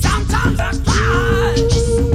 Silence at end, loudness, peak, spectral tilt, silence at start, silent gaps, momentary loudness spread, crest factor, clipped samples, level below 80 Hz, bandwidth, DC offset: 0 s; -16 LUFS; -2 dBFS; -5 dB/octave; 0 s; none; 2 LU; 12 dB; under 0.1%; -20 dBFS; 14 kHz; under 0.1%